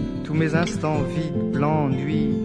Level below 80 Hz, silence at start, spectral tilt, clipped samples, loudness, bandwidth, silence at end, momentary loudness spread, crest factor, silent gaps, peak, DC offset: -42 dBFS; 0 s; -7.5 dB/octave; under 0.1%; -23 LUFS; 10.5 kHz; 0 s; 4 LU; 14 dB; none; -8 dBFS; under 0.1%